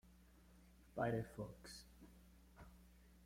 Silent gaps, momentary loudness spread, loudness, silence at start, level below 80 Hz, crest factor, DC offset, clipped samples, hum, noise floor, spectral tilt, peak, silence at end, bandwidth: none; 25 LU; -47 LUFS; 0.05 s; -66 dBFS; 24 dB; under 0.1%; under 0.1%; none; -67 dBFS; -6.5 dB/octave; -28 dBFS; 0 s; 16.5 kHz